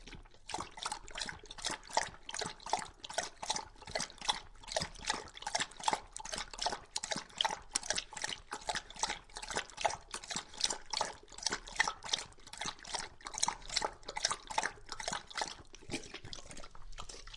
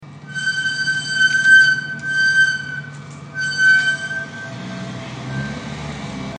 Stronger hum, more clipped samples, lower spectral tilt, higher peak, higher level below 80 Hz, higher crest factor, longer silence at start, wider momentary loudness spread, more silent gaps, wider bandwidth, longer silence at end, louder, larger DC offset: neither; neither; second, -0.5 dB/octave vs -2.5 dB/octave; second, -10 dBFS vs -2 dBFS; second, -58 dBFS vs -52 dBFS; first, 30 dB vs 16 dB; about the same, 0 s vs 0 s; second, 9 LU vs 20 LU; neither; about the same, 11.5 kHz vs 10.5 kHz; about the same, 0 s vs 0 s; second, -38 LUFS vs -15 LUFS; neither